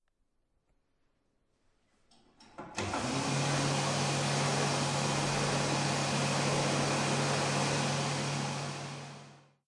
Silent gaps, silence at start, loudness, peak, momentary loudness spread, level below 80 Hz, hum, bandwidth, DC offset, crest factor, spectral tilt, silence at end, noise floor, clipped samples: none; 2.4 s; -31 LUFS; -18 dBFS; 10 LU; -62 dBFS; none; 11.5 kHz; under 0.1%; 14 dB; -4 dB/octave; 0.3 s; -76 dBFS; under 0.1%